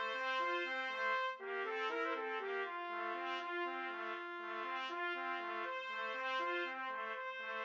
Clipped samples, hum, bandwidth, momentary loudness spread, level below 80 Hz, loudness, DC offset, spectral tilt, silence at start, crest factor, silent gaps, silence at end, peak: under 0.1%; none; 7.8 kHz; 6 LU; under -90 dBFS; -40 LUFS; under 0.1%; -2 dB/octave; 0 s; 16 dB; none; 0 s; -26 dBFS